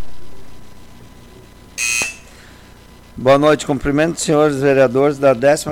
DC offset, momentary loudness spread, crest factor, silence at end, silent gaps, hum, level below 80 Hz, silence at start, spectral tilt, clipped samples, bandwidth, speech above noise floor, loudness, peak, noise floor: under 0.1%; 8 LU; 14 dB; 0 s; none; 60 Hz at -45 dBFS; -42 dBFS; 0 s; -4.5 dB/octave; under 0.1%; 17 kHz; 28 dB; -15 LUFS; -4 dBFS; -42 dBFS